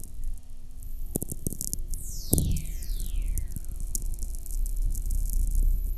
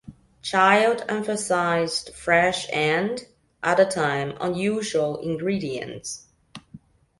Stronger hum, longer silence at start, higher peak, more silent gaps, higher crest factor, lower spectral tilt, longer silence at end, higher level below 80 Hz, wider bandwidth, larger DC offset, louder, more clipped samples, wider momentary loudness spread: neither; about the same, 0 s vs 0.1 s; first, 0 dBFS vs -4 dBFS; neither; first, 28 dB vs 20 dB; about the same, -5 dB/octave vs -4 dB/octave; second, 0 s vs 0.4 s; first, -30 dBFS vs -58 dBFS; first, 15 kHz vs 11.5 kHz; neither; second, -33 LUFS vs -23 LUFS; neither; first, 15 LU vs 12 LU